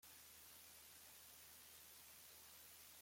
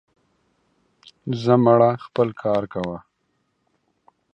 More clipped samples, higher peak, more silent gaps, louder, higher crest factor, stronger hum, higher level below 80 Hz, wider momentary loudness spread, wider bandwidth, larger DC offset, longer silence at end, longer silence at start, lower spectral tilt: neither; second, -50 dBFS vs -2 dBFS; neither; second, -60 LUFS vs -20 LUFS; second, 14 dB vs 22 dB; neither; second, -86 dBFS vs -60 dBFS; second, 0 LU vs 16 LU; first, 16.5 kHz vs 7.6 kHz; neither; second, 0 s vs 1.35 s; second, 0 s vs 1.25 s; second, 0 dB/octave vs -8.5 dB/octave